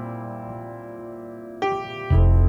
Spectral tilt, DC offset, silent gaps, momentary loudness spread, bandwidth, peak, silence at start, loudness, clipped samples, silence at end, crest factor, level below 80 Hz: -8.5 dB/octave; under 0.1%; none; 17 LU; 6.2 kHz; -8 dBFS; 0 s; -26 LUFS; under 0.1%; 0 s; 14 dB; -26 dBFS